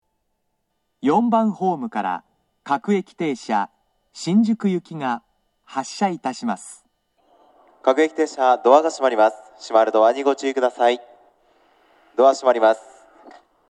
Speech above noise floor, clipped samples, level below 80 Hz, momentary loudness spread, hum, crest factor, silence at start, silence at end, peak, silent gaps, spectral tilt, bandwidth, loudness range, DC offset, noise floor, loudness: 55 dB; under 0.1%; -76 dBFS; 13 LU; none; 20 dB; 1.05 s; 0.9 s; 0 dBFS; none; -5.5 dB/octave; 11.5 kHz; 6 LU; under 0.1%; -74 dBFS; -20 LUFS